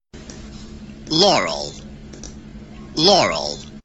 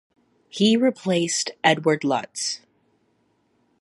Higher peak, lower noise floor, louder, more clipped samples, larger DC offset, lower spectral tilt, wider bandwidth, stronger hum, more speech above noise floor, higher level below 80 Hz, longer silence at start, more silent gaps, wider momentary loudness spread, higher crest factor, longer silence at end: about the same, -2 dBFS vs -2 dBFS; second, -37 dBFS vs -67 dBFS; first, -17 LUFS vs -22 LUFS; neither; neither; about the same, -3 dB/octave vs -3.5 dB/octave; second, 8.4 kHz vs 11.5 kHz; neither; second, 20 dB vs 45 dB; first, -44 dBFS vs -70 dBFS; second, 0.15 s vs 0.55 s; neither; first, 24 LU vs 9 LU; about the same, 20 dB vs 22 dB; second, 0.05 s vs 1.25 s